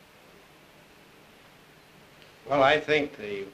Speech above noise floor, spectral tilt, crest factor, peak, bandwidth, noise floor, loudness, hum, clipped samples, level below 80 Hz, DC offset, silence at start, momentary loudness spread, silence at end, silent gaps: 29 dB; -5 dB/octave; 22 dB; -10 dBFS; 15 kHz; -55 dBFS; -25 LUFS; none; under 0.1%; -64 dBFS; under 0.1%; 2.45 s; 15 LU; 0.05 s; none